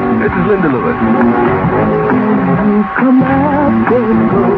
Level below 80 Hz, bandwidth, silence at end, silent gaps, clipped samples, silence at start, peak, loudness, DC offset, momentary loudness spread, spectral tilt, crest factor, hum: -34 dBFS; 4.8 kHz; 0 s; none; under 0.1%; 0 s; 0 dBFS; -11 LUFS; under 0.1%; 2 LU; -10.5 dB/octave; 10 dB; none